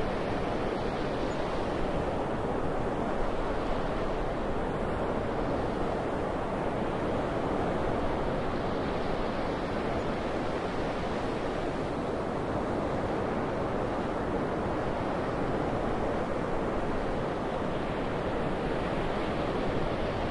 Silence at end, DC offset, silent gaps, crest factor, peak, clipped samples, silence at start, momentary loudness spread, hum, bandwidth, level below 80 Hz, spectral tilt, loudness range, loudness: 0 s; under 0.1%; none; 14 dB; -16 dBFS; under 0.1%; 0 s; 1 LU; none; 11 kHz; -40 dBFS; -7 dB/octave; 1 LU; -32 LUFS